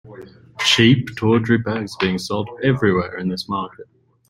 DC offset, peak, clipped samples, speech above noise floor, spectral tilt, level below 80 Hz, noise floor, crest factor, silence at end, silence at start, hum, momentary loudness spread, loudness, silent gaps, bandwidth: under 0.1%; -2 dBFS; under 0.1%; 22 dB; -5 dB/octave; -52 dBFS; -40 dBFS; 18 dB; 0.45 s; 0.05 s; none; 12 LU; -19 LUFS; none; 16 kHz